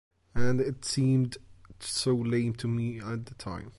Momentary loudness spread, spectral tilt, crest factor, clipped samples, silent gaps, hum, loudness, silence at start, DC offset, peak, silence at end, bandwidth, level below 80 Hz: 13 LU; -5.5 dB/octave; 16 dB; under 0.1%; none; none; -30 LUFS; 0.1 s; under 0.1%; -14 dBFS; 0 s; 11.5 kHz; -54 dBFS